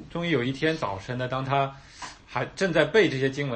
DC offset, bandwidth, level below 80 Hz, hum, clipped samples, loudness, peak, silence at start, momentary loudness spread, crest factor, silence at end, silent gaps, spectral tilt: under 0.1%; 8.8 kHz; -54 dBFS; none; under 0.1%; -26 LUFS; -6 dBFS; 0 s; 12 LU; 20 dB; 0 s; none; -5.5 dB/octave